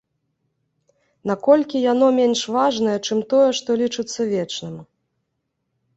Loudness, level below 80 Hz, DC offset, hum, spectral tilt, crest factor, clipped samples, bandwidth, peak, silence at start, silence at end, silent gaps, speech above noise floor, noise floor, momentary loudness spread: -19 LUFS; -66 dBFS; under 0.1%; none; -4.5 dB/octave; 18 dB; under 0.1%; 8.2 kHz; -2 dBFS; 1.25 s; 1.15 s; none; 56 dB; -75 dBFS; 12 LU